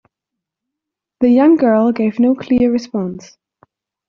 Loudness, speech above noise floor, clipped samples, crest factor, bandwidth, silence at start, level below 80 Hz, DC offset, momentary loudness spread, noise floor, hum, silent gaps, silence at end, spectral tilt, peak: -14 LUFS; 69 dB; under 0.1%; 14 dB; 6.6 kHz; 1.2 s; -52 dBFS; under 0.1%; 12 LU; -82 dBFS; none; none; 0.9 s; -7 dB/octave; -2 dBFS